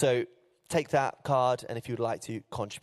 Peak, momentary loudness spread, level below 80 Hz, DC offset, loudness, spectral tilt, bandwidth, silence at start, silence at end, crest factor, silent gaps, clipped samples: -12 dBFS; 10 LU; -66 dBFS; under 0.1%; -31 LUFS; -5.5 dB/octave; 14 kHz; 0 s; 0.05 s; 18 dB; none; under 0.1%